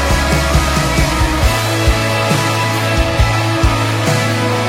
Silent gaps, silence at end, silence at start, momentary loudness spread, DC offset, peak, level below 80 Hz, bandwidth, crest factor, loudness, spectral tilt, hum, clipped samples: none; 0 s; 0 s; 1 LU; under 0.1%; 0 dBFS; -20 dBFS; 16.5 kHz; 14 dB; -14 LUFS; -4.5 dB/octave; none; under 0.1%